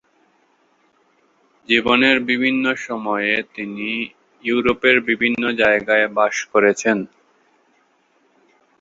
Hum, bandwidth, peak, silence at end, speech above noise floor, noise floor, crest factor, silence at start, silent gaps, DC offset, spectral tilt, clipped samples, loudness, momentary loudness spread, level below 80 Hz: none; 7.8 kHz; -2 dBFS; 1.75 s; 43 dB; -61 dBFS; 20 dB; 1.7 s; none; under 0.1%; -3.5 dB/octave; under 0.1%; -18 LUFS; 10 LU; -58 dBFS